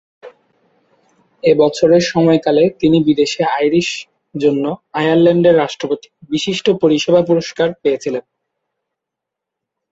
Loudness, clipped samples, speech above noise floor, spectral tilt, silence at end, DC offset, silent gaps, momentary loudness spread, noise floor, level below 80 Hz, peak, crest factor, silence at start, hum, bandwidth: -14 LUFS; under 0.1%; 68 dB; -5.5 dB/octave; 1.7 s; under 0.1%; none; 10 LU; -81 dBFS; -56 dBFS; -2 dBFS; 14 dB; 0.25 s; none; 8 kHz